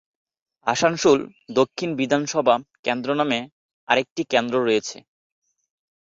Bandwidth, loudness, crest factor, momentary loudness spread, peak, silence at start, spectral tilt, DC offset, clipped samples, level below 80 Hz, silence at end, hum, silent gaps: 7.8 kHz; -22 LUFS; 20 dB; 7 LU; -4 dBFS; 0.65 s; -4 dB/octave; under 0.1%; under 0.1%; -64 dBFS; 1.2 s; none; 2.79-2.83 s, 3.52-3.87 s, 4.11-4.16 s